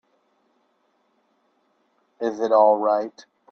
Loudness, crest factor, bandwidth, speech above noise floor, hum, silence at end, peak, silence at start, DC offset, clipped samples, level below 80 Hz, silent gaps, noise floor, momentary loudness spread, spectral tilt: -20 LUFS; 20 dB; 6.6 kHz; 48 dB; none; 0.4 s; -4 dBFS; 2.2 s; under 0.1%; under 0.1%; -78 dBFS; none; -68 dBFS; 13 LU; -5.5 dB/octave